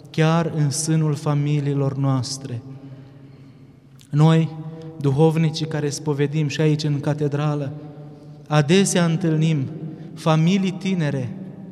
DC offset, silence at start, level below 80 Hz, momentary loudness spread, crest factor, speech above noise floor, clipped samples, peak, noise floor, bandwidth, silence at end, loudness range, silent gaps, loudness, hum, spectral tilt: under 0.1%; 0.05 s; -62 dBFS; 17 LU; 18 dB; 27 dB; under 0.1%; -2 dBFS; -47 dBFS; 12.5 kHz; 0 s; 3 LU; none; -21 LUFS; none; -6 dB/octave